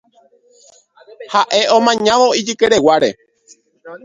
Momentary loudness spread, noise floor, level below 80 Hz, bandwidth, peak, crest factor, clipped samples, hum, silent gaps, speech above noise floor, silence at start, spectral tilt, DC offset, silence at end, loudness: 5 LU; -52 dBFS; -56 dBFS; 9.6 kHz; 0 dBFS; 16 dB; under 0.1%; none; none; 39 dB; 1.2 s; -3 dB/octave; under 0.1%; 0.1 s; -13 LUFS